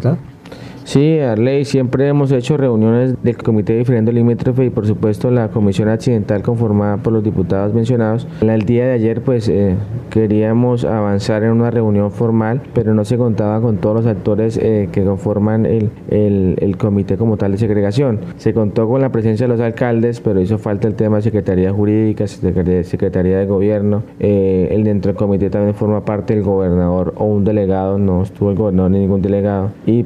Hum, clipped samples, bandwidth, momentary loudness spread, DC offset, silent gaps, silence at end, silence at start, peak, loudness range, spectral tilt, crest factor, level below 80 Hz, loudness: none; under 0.1%; 10 kHz; 3 LU; under 0.1%; none; 0 s; 0 s; 0 dBFS; 1 LU; -9 dB/octave; 14 dB; -42 dBFS; -15 LUFS